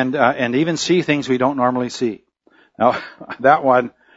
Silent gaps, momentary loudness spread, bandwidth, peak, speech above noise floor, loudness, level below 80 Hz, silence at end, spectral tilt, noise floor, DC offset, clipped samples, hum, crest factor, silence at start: none; 10 LU; 8 kHz; 0 dBFS; 38 dB; -18 LUFS; -60 dBFS; 0.25 s; -5 dB/octave; -55 dBFS; under 0.1%; under 0.1%; none; 18 dB; 0 s